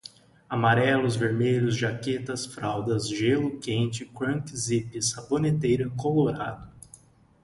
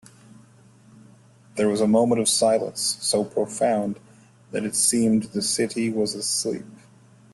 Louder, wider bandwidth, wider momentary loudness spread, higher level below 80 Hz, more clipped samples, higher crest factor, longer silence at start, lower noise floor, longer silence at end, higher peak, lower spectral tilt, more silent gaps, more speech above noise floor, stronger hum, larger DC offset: second, -26 LUFS vs -22 LUFS; about the same, 11.5 kHz vs 12.5 kHz; about the same, 9 LU vs 11 LU; first, -56 dBFS vs -64 dBFS; neither; about the same, 18 dB vs 18 dB; second, 0.5 s vs 1.55 s; about the same, -54 dBFS vs -52 dBFS; first, 0.75 s vs 0.6 s; about the same, -8 dBFS vs -6 dBFS; first, -5.5 dB/octave vs -3.5 dB/octave; neither; about the same, 29 dB vs 30 dB; neither; neither